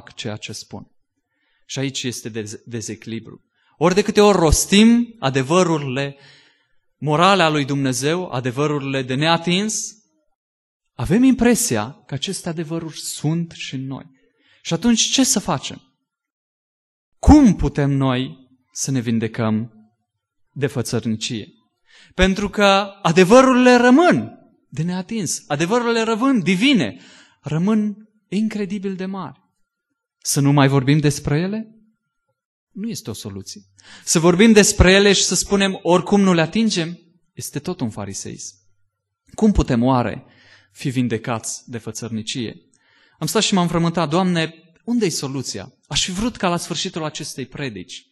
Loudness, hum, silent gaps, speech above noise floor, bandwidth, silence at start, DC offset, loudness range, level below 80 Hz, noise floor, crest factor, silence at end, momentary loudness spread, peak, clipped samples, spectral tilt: -18 LUFS; none; 10.35-10.80 s, 16.32-17.12 s, 32.45-32.67 s; 60 dB; 12.5 kHz; 0.2 s; under 0.1%; 9 LU; -36 dBFS; -78 dBFS; 18 dB; 0.15 s; 18 LU; 0 dBFS; under 0.1%; -4.5 dB/octave